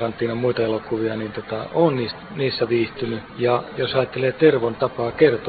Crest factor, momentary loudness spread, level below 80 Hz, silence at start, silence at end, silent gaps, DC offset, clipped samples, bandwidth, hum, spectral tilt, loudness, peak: 20 dB; 11 LU; -52 dBFS; 0 s; 0 s; none; under 0.1%; under 0.1%; 4.9 kHz; none; -11 dB/octave; -22 LUFS; -2 dBFS